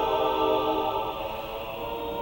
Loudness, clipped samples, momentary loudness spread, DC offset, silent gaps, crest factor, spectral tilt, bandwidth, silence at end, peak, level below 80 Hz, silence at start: -28 LUFS; under 0.1%; 9 LU; under 0.1%; none; 14 dB; -5.5 dB/octave; 19 kHz; 0 s; -12 dBFS; -48 dBFS; 0 s